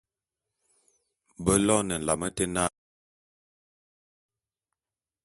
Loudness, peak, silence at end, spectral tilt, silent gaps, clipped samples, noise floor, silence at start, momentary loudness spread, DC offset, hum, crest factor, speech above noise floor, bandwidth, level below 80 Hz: -26 LUFS; -6 dBFS; 2.55 s; -4 dB/octave; none; under 0.1%; under -90 dBFS; 1.4 s; 8 LU; under 0.1%; none; 26 dB; over 64 dB; 12 kHz; -52 dBFS